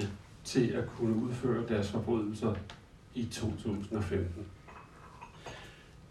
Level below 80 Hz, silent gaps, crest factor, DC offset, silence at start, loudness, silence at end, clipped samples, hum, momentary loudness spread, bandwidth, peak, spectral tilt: -58 dBFS; none; 20 dB; under 0.1%; 0 s; -34 LUFS; 0 s; under 0.1%; none; 20 LU; 13 kHz; -16 dBFS; -6.5 dB/octave